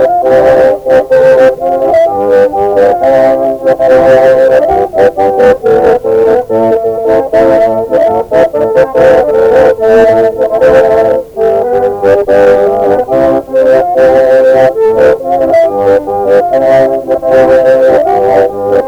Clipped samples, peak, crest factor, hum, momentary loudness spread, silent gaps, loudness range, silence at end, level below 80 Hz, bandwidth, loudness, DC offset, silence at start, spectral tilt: 0.3%; 0 dBFS; 6 dB; none; 4 LU; none; 1 LU; 0 s; -36 dBFS; 9.2 kHz; -7 LUFS; under 0.1%; 0 s; -6.5 dB/octave